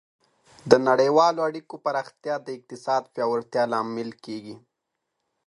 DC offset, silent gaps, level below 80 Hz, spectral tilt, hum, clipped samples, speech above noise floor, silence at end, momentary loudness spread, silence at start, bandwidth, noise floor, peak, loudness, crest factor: under 0.1%; none; -70 dBFS; -5 dB/octave; none; under 0.1%; 57 dB; 0.9 s; 18 LU; 0.65 s; 11 kHz; -81 dBFS; 0 dBFS; -24 LUFS; 24 dB